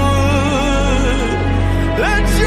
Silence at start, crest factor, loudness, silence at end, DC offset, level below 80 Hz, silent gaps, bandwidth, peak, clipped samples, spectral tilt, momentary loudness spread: 0 s; 12 dB; -16 LUFS; 0 s; under 0.1%; -18 dBFS; none; 14 kHz; -2 dBFS; under 0.1%; -5.5 dB/octave; 2 LU